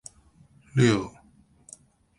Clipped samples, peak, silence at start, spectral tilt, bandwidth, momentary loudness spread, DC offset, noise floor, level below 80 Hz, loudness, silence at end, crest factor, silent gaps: under 0.1%; -8 dBFS; 0.75 s; -6 dB/octave; 11.5 kHz; 26 LU; under 0.1%; -59 dBFS; -60 dBFS; -24 LUFS; 1.1 s; 20 dB; none